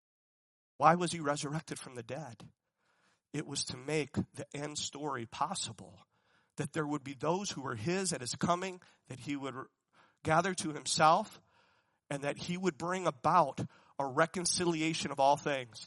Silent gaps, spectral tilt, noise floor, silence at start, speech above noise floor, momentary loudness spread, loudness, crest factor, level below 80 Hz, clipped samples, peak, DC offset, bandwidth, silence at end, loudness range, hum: none; -4 dB/octave; -75 dBFS; 0.8 s; 40 dB; 15 LU; -34 LUFS; 24 dB; -72 dBFS; under 0.1%; -10 dBFS; under 0.1%; 11.5 kHz; 0 s; 7 LU; none